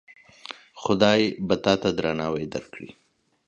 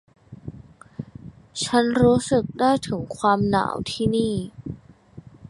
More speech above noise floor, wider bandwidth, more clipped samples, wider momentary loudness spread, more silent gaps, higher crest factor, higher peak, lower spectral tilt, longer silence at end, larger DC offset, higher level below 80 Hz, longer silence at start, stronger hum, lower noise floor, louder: second, 20 dB vs 25 dB; second, 8.4 kHz vs 11.5 kHz; neither; about the same, 22 LU vs 22 LU; neither; about the same, 22 dB vs 18 dB; about the same, -4 dBFS vs -4 dBFS; about the same, -5.5 dB/octave vs -5.5 dB/octave; first, 0.6 s vs 0 s; neither; second, -54 dBFS vs -48 dBFS; first, 0.5 s vs 0.3 s; neither; about the same, -44 dBFS vs -46 dBFS; about the same, -24 LUFS vs -22 LUFS